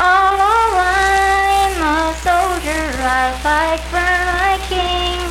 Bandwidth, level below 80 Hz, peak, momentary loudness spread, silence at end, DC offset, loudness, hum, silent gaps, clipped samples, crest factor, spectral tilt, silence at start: 16.5 kHz; -28 dBFS; -2 dBFS; 5 LU; 0 s; under 0.1%; -15 LUFS; none; none; under 0.1%; 14 dB; -3.5 dB/octave; 0 s